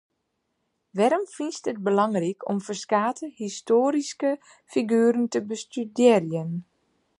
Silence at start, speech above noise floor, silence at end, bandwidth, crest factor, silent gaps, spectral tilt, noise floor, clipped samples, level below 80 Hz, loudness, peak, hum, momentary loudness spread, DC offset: 0.95 s; 53 dB; 0.6 s; 11 kHz; 20 dB; none; -5.5 dB/octave; -77 dBFS; under 0.1%; -76 dBFS; -25 LUFS; -6 dBFS; none; 12 LU; under 0.1%